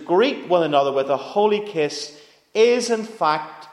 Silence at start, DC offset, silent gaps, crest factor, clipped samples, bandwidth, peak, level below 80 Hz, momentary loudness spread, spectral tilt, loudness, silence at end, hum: 0 s; under 0.1%; none; 16 dB; under 0.1%; 12 kHz; -4 dBFS; -76 dBFS; 8 LU; -4 dB/octave; -20 LUFS; 0 s; none